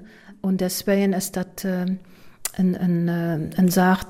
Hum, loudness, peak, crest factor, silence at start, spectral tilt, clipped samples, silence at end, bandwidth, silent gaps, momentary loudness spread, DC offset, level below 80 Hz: none; -23 LUFS; -8 dBFS; 14 dB; 0 s; -6 dB/octave; under 0.1%; 0 s; 16 kHz; none; 10 LU; under 0.1%; -52 dBFS